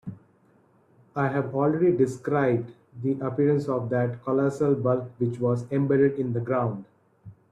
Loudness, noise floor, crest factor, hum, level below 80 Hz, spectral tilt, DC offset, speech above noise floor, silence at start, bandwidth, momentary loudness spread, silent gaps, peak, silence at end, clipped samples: -25 LUFS; -61 dBFS; 16 dB; none; -64 dBFS; -9 dB/octave; under 0.1%; 37 dB; 0.05 s; 10.5 kHz; 8 LU; none; -10 dBFS; 0.2 s; under 0.1%